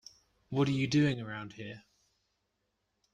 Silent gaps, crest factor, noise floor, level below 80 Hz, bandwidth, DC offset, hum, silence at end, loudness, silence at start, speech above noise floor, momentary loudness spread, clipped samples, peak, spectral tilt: none; 18 dB; -81 dBFS; -66 dBFS; 9.6 kHz; under 0.1%; none; 1.35 s; -32 LUFS; 0.5 s; 50 dB; 18 LU; under 0.1%; -16 dBFS; -6.5 dB/octave